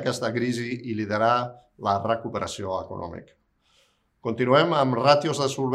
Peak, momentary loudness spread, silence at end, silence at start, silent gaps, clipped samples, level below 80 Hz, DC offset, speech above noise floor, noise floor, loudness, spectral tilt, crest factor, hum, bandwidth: -4 dBFS; 15 LU; 0 s; 0 s; none; under 0.1%; -66 dBFS; under 0.1%; 41 dB; -65 dBFS; -24 LUFS; -5.5 dB/octave; 20 dB; none; 13 kHz